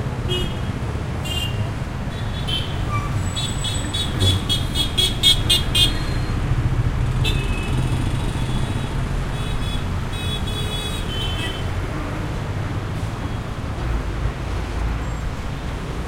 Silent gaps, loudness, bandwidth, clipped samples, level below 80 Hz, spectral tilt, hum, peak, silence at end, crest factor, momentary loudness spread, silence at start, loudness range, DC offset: none; -22 LUFS; 16.5 kHz; under 0.1%; -28 dBFS; -4.5 dB/octave; none; -2 dBFS; 0 s; 20 dB; 10 LU; 0 s; 8 LU; under 0.1%